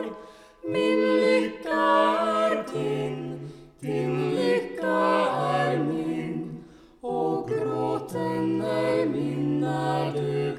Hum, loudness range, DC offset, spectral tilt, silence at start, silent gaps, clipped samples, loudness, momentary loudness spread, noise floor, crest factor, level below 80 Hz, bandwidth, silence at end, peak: none; 4 LU; under 0.1%; -6.5 dB/octave; 0 s; none; under 0.1%; -25 LUFS; 13 LU; -47 dBFS; 16 dB; -62 dBFS; 14.5 kHz; 0 s; -10 dBFS